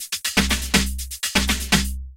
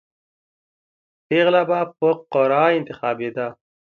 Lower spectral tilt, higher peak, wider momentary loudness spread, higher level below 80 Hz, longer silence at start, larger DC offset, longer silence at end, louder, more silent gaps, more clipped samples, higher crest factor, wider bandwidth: second, -2.5 dB/octave vs -7.5 dB/octave; about the same, -2 dBFS vs -4 dBFS; second, 4 LU vs 10 LU; first, -30 dBFS vs -70 dBFS; second, 0 s vs 1.3 s; neither; second, 0 s vs 0.4 s; about the same, -20 LUFS vs -20 LUFS; neither; neither; about the same, 20 dB vs 18 dB; first, 17 kHz vs 5.8 kHz